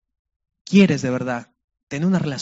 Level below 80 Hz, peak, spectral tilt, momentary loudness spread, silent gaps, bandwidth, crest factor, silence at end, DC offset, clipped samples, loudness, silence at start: -60 dBFS; -2 dBFS; -6.5 dB/octave; 14 LU; 1.64-1.68 s, 1.83-1.87 s; 8 kHz; 18 dB; 0 s; under 0.1%; under 0.1%; -20 LUFS; 0.7 s